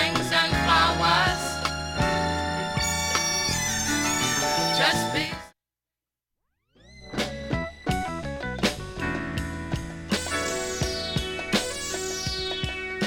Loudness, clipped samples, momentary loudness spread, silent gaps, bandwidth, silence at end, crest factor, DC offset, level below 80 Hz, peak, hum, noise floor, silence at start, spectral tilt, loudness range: -25 LUFS; under 0.1%; 11 LU; none; 17.5 kHz; 0 s; 20 dB; under 0.1%; -42 dBFS; -8 dBFS; none; -90 dBFS; 0 s; -3 dB/octave; 8 LU